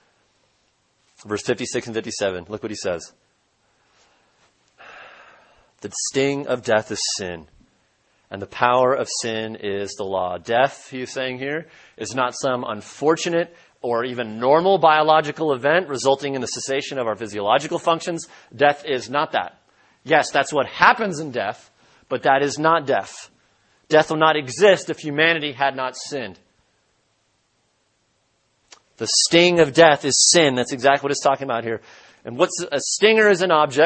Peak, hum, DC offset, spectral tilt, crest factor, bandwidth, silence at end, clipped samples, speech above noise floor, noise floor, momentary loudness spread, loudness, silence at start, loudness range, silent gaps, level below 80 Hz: 0 dBFS; none; under 0.1%; -3 dB/octave; 22 dB; 8.8 kHz; 0 s; under 0.1%; 47 dB; -67 dBFS; 16 LU; -20 LUFS; 1.25 s; 11 LU; none; -62 dBFS